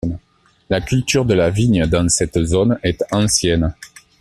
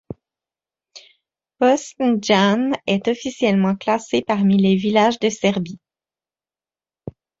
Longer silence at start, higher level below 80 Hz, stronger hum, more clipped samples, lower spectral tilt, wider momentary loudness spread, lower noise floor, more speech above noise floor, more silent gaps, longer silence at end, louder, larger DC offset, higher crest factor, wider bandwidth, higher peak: about the same, 0.05 s vs 0.1 s; first, -34 dBFS vs -60 dBFS; neither; neither; about the same, -5 dB/octave vs -5.5 dB/octave; second, 8 LU vs 22 LU; second, -57 dBFS vs under -90 dBFS; second, 41 dB vs over 72 dB; neither; about the same, 0.35 s vs 0.3 s; about the same, -17 LUFS vs -18 LUFS; neither; about the same, 14 dB vs 18 dB; first, 14 kHz vs 7.8 kHz; about the same, -2 dBFS vs -2 dBFS